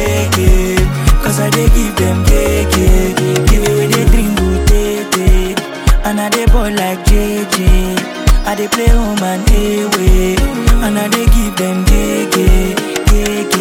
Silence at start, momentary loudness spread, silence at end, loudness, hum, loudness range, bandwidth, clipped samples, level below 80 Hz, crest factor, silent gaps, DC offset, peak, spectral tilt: 0 s; 3 LU; 0 s; -13 LUFS; none; 2 LU; 17 kHz; under 0.1%; -12 dBFS; 10 dB; none; under 0.1%; 0 dBFS; -5 dB/octave